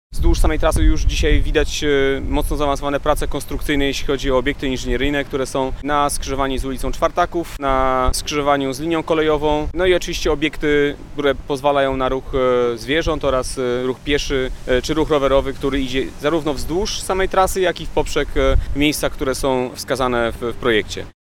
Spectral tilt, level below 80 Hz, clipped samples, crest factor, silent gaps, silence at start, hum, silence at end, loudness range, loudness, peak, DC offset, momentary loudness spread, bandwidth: -4.5 dB/octave; -24 dBFS; under 0.1%; 16 dB; none; 0.1 s; none; 0.15 s; 2 LU; -19 LUFS; -2 dBFS; under 0.1%; 5 LU; 16.5 kHz